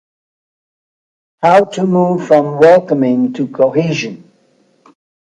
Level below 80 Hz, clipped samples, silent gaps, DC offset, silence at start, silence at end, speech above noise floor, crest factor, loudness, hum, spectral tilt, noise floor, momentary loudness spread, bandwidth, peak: -62 dBFS; under 0.1%; none; under 0.1%; 1.4 s; 1.2 s; 43 dB; 14 dB; -12 LUFS; none; -7 dB/octave; -55 dBFS; 9 LU; 10.5 kHz; 0 dBFS